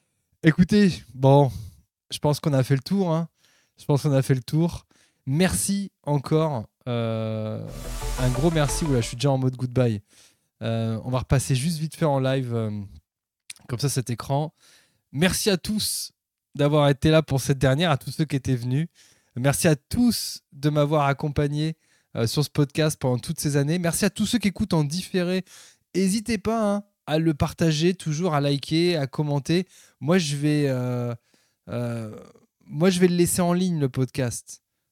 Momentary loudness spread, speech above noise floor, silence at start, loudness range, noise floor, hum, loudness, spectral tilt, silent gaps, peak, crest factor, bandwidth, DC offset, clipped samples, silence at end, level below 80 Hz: 14 LU; 40 dB; 0.45 s; 3 LU; -63 dBFS; none; -24 LUFS; -5.5 dB/octave; none; -4 dBFS; 20 dB; 16 kHz; under 0.1%; under 0.1%; 0.35 s; -44 dBFS